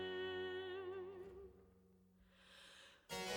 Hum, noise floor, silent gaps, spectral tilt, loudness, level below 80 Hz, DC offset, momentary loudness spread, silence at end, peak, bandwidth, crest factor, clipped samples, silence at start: none; -71 dBFS; none; -3.5 dB/octave; -49 LUFS; -76 dBFS; under 0.1%; 18 LU; 0 s; -32 dBFS; 19 kHz; 18 dB; under 0.1%; 0 s